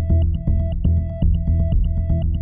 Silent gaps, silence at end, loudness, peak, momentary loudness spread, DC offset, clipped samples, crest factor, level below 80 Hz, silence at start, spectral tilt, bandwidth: none; 0 s; -21 LUFS; -8 dBFS; 2 LU; under 0.1%; under 0.1%; 10 dB; -22 dBFS; 0 s; -12.5 dB/octave; 3.2 kHz